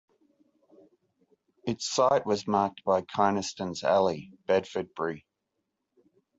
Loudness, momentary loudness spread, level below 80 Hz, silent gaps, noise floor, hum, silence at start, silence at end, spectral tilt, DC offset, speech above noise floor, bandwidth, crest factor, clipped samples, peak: -28 LUFS; 11 LU; -64 dBFS; none; -82 dBFS; none; 1.65 s; 1.2 s; -4.5 dB/octave; under 0.1%; 55 dB; 8 kHz; 20 dB; under 0.1%; -10 dBFS